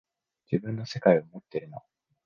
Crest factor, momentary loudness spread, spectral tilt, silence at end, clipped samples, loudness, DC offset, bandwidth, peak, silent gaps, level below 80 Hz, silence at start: 24 dB; 18 LU; -7.5 dB/octave; 0.45 s; under 0.1%; -28 LUFS; under 0.1%; 7.2 kHz; -6 dBFS; none; -68 dBFS; 0.5 s